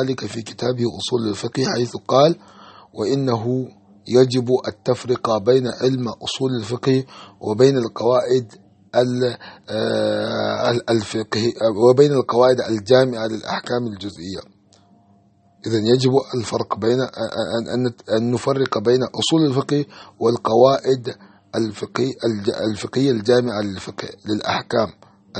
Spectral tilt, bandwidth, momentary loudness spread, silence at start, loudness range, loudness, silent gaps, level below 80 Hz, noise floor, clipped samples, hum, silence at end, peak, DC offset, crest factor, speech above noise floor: -6 dB/octave; 8.8 kHz; 11 LU; 0 s; 4 LU; -20 LUFS; none; -60 dBFS; -55 dBFS; under 0.1%; none; 0 s; 0 dBFS; under 0.1%; 20 dB; 36 dB